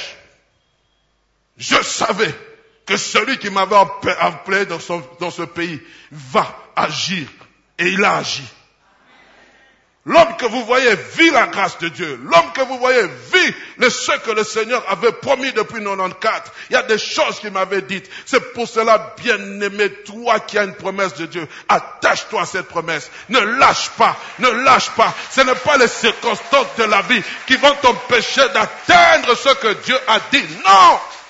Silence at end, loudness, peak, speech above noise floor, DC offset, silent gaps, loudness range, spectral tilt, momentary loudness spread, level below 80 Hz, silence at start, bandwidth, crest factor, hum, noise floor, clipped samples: 0.05 s; -15 LUFS; 0 dBFS; 47 dB; under 0.1%; none; 7 LU; -2.5 dB/octave; 11 LU; -54 dBFS; 0 s; 8 kHz; 16 dB; none; -63 dBFS; under 0.1%